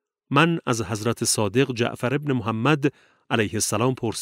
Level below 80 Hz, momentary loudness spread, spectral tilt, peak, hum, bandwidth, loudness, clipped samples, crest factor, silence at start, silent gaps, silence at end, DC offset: -60 dBFS; 6 LU; -4.5 dB/octave; -2 dBFS; none; 16 kHz; -23 LUFS; under 0.1%; 20 dB; 0.3 s; none; 0 s; under 0.1%